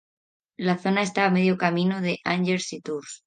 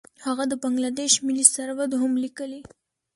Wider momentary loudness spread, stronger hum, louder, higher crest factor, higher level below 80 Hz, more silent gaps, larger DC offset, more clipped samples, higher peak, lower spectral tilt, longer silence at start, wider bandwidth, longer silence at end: second, 9 LU vs 16 LU; neither; about the same, -24 LUFS vs -22 LUFS; about the same, 20 dB vs 24 dB; about the same, -70 dBFS vs -68 dBFS; neither; neither; neither; second, -6 dBFS vs -2 dBFS; first, -5.5 dB/octave vs -1 dB/octave; first, 0.6 s vs 0.2 s; second, 9.6 kHz vs 12 kHz; second, 0.1 s vs 0.55 s